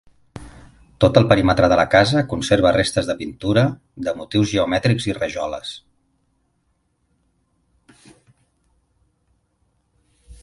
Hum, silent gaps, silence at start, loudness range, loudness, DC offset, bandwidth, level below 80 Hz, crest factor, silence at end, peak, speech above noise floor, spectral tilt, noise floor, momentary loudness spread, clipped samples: none; none; 0.35 s; 13 LU; -18 LUFS; under 0.1%; 11.5 kHz; -42 dBFS; 20 dB; 0.1 s; 0 dBFS; 50 dB; -6 dB/octave; -67 dBFS; 16 LU; under 0.1%